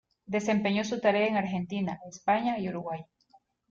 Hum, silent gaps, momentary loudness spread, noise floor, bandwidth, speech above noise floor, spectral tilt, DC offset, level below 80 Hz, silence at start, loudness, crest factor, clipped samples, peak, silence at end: none; none; 9 LU; -65 dBFS; 7.6 kHz; 36 dB; -5.5 dB/octave; under 0.1%; -68 dBFS; 0.3 s; -29 LUFS; 16 dB; under 0.1%; -14 dBFS; 0.65 s